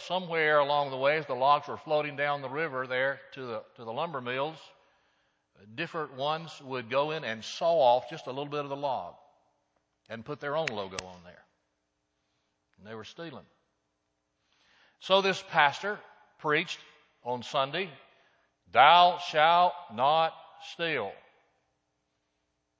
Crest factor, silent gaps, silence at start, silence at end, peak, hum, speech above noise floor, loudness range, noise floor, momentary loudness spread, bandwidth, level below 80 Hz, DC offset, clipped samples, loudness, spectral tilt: 26 dB; none; 0 s; 1.65 s; -6 dBFS; none; 51 dB; 14 LU; -79 dBFS; 18 LU; 8 kHz; -76 dBFS; under 0.1%; under 0.1%; -28 LUFS; -4 dB/octave